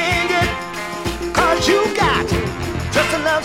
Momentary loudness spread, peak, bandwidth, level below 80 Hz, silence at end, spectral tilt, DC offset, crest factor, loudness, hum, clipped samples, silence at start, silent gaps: 9 LU; 0 dBFS; 17 kHz; -34 dBFS; 0 s; -4 dB/octave; under 0.1%; 18 dB; -18 LUFS; none; under 0.1%; 0 s; none